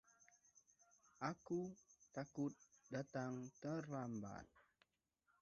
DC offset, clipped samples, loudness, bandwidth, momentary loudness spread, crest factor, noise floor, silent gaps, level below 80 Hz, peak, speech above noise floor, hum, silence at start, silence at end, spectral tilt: under 0.1%; under 0.1%; -49 LUFS; 7.4 kHz; 14 LU; 22 dB; -86 dBFS; none; -80 dBFS; -30 dBFS; 38 dB; none; 0.2 s; 0.8 s; -7 dB/octave